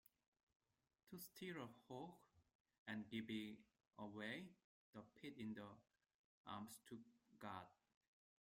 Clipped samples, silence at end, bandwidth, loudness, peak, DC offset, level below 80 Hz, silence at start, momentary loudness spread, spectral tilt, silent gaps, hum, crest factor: under 0.1%; 0.7 s; 16 kHz; -56 LUFS; -36 dBFS; under 0.1%; -90 dBFS; 1.05 s; 13 LU; -5 dB/octave; 2.55-2.65 s, 2.78-2.86 s, 3.87-3.91 s, 4.64-4.93 s, 6.14-6.44 s; none; 22 dB